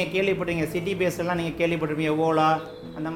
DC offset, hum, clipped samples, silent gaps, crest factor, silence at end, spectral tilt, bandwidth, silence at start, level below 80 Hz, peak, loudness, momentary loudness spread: under 0.1%; none; under 0.1%; none; 14 dB; 0 s; -6 dB/octave; 16.5 kHz; 0 s; -52 dBFS; -10 dBFS; -25 LUFS; 6 LU